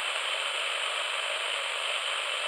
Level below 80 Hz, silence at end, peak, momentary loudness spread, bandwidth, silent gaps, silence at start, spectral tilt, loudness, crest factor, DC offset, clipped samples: under -90 dBFS; 0 s; -16 dBFS; 1 LU; 16 kHz; none; 0 s; 4.5 dB/octave; -29 LUFS; 16 dB; under 0.1%; under 0.1%